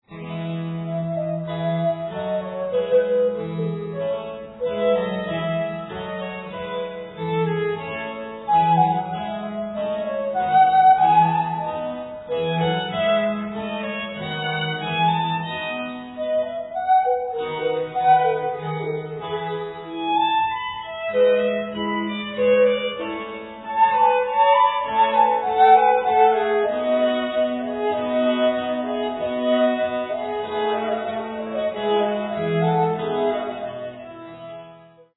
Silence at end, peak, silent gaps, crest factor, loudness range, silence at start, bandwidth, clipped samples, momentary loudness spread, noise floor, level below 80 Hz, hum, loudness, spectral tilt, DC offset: 0.35 s; -4 dBFS; none; 18 dB; 7 LU; 0.1 s; 4.1 kHz; under 0.1%; 12 LU; -47 dBFS; -58 dBFS; none; -22 LUFS; -9.5 dB/octave; under 0.1%